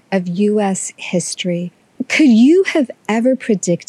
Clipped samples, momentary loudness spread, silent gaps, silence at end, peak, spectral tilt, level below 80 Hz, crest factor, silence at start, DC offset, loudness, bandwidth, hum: under 0.1%; 12 LU; none; 0.05 s; -2 dBFS; -5 dB/octave; -68 dBFS; 12 dB; 0.1 s; under 0.1%; -15 LUFS; 12 kHz; none